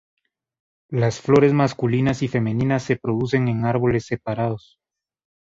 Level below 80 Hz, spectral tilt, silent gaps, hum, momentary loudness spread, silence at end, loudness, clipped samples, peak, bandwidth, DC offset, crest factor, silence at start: -52 dBFS; -7.5 dB/octave; none; none; 9 LU; 1 s; -21 LUFS; under 0.1%; -4 dBFS; 7.8 kHz; under 0.1%; 18 dB; 0.9 s